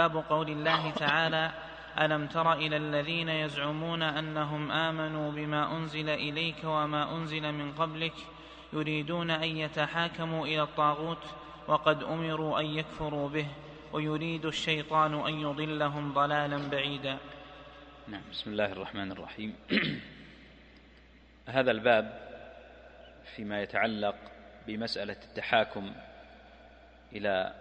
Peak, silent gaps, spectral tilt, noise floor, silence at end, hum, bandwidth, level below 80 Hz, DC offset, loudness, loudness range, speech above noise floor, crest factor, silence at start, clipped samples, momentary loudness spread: -10 dBFS; none; -6 dB/octave; -57 dBFS; 0 s; none; 9 kHz; -60 dBFS; under 0.1%; -31 LUFS; 6 LU; 26 dB; 24 dB; 0 s; under 0.1%; 18 LU